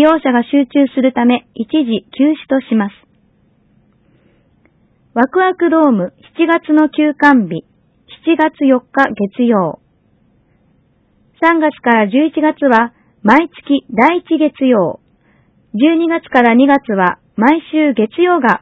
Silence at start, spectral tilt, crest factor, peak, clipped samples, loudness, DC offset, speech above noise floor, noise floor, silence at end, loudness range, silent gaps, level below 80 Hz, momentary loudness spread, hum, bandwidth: 0 s; -7.5 dB/octave; 14 dB; 0 dBFS; 0.2%; -13 LUFS; under 0.1%; 43 dB; -55 dBFS; 0.05 s; 5 LU; none; -58 dBFS; 7 LU; none; 6.4 kHz